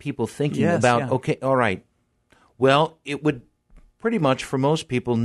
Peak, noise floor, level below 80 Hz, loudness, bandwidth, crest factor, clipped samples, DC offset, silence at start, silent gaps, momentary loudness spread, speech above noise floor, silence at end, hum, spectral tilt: -4 dBFS; -62 dBFS; -56 dBFS; -22 LUFS; 12.5 kHz; 20 dB; under 0.1%; under 0.1%; 0.05 s; none; 8 LU; 41 dB; 0 s; none; -6 dB/octave